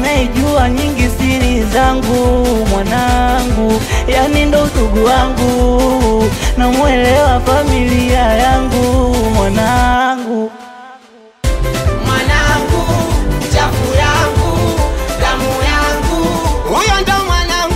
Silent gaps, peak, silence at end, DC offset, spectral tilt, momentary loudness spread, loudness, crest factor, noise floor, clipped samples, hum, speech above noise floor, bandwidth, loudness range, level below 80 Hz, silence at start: none; -2 dBFS; 0 s; under 0.1%; -5 dB/octave; 4 LU; -13 LUFS; 10 dB; -40 dBFS; under 0.1%; none; 29 dB; 16 kHz; 3 LU; -18 dBFS; 0 s